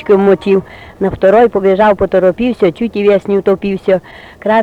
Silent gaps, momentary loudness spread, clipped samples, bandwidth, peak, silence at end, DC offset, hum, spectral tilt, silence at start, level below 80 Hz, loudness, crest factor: none; 6 LU; under 0.1%; 7.8 kHz; 0 dBFS; 0 s; under 0.1%; none; -8 dB/octave; 0 s; -40 dBFS; -12 LUFS; 10 dB